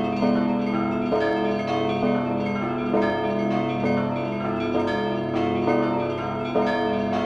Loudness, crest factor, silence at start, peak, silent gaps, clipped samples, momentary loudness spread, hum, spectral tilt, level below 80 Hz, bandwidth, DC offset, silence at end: -24 LUFS; 14 dB; 0 s; -10 dBFS; none; under 0.1%; 4 LU; 50 Hz at -50 dBFS; -7.5 dB/octave; -52 dBFS; 7.6 kHz; under 0.1%; 0 s